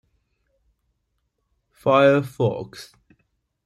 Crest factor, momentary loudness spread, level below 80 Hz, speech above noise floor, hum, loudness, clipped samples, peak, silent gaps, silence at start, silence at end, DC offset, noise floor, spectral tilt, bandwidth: 20 dB; 21 LU; -62 dBFS; 54 dB; none; -19 LUFS; under 0.1%; -4 dBFS; none; 1.85 s; 0.8 s; under 0.1%; -74 dBFS; -7 dB/octave; 13 kHz